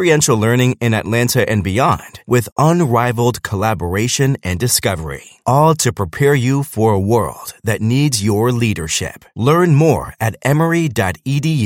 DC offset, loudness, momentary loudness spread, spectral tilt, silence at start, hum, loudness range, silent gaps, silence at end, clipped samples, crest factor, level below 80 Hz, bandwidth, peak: under 0.1%; -15 LUFS; 7 LU; -5 dB/octave; 0 s; none; 1 LU; 2.52-2.56 s; 0 s; under 0.1%; 14 dB; -44 dBFS; 16.5 kHz; 0 dBFS